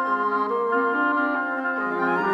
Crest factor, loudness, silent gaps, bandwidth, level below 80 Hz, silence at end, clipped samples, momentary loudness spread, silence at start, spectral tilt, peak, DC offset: 12 dB; -23 LUFS; none; 8 kHz; -70 dBFS; 0 s; under 0.1%; 4 LU; 0 s; -7 dB/octave; -10 dBFS; under 0.1%